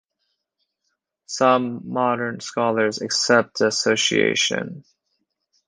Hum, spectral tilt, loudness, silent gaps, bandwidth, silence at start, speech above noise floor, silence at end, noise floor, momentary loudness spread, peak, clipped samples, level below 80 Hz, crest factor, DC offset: none; -3 dB/octave; -20 LUFS; none; 10.5 kHz; 1.3 s; 55 dB; 0.85 s; -76 dBFS; 9 LU; -2 dBFS; under 0.1%; -68 dBFS; 20 dB; under 0.1%